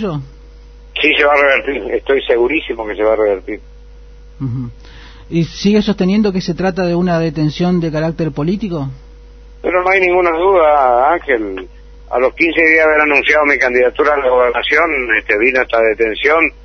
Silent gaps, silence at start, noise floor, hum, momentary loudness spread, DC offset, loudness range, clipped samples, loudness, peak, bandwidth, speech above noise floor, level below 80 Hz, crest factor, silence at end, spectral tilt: none; 0 s; -36 dBFS; none; 13 LU; under 0.1%; 7 LU; under 0.1%; -13 LUFS; 0 dBFS; 6.6 kHz; 23 dB; -38 dBFS; 14 dB; 0 s; -6.5 dB/octave